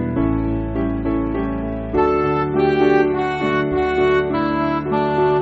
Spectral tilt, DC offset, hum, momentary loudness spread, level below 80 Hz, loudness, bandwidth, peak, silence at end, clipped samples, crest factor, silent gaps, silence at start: -6 dB/octave; under 0.1%; none; 6 LU; -34 dBFS; -19 LUFS; 7.4 kHz; -4 dBFS; 0 s; under 0.1%; 14 dB; none; 0 s